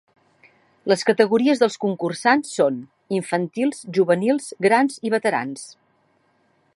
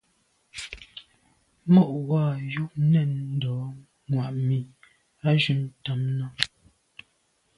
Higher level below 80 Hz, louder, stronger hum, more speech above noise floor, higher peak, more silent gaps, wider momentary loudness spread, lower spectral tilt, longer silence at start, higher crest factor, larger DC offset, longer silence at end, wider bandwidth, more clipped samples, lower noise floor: second, -72 dBFS vs -62 dBFS; first, -20 LUFS vs -25 LUFS; neither; about the same, 43 dB vs 45 dB; about the same, -2 dBFS vs 0 dBFS; neither; second, 10 LU vs 19 LU; second, -5 dB/octave vs -7 dB/octave; first, 0.85 s vs 0.55 s; second, 18 dB vs 26 dB; neither; about the same, 1.05 s vs 1.1 s; about the same, 11.5 kHz vs 11.5 kHz; neither; second, -64 dBFS vs -69 dBFS